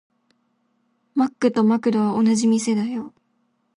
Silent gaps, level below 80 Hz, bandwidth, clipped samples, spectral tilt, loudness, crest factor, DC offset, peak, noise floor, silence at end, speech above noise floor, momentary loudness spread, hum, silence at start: none; -68 dBFS; 11 kHz; under 0.1%; -5.5 dB/octave; -20 LUFS; 14 dB; under 0.1%; -8 dBFS; -68 dBFS; 0.7 s; 49 dB; 10 LU; none; 1.15 s